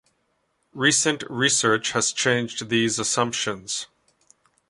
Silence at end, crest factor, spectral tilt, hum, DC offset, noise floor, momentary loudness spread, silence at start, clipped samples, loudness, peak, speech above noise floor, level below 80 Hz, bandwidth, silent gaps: 0.85 s; 20 dB; -2.5 dB/octave; none; under 0.1%; -71 dBFS; 10 LU; 0.75 s; under 0.1%; -22 LUFS; -4 dBFS; 48 dB; -64 dBFS; 11.5 kHz; none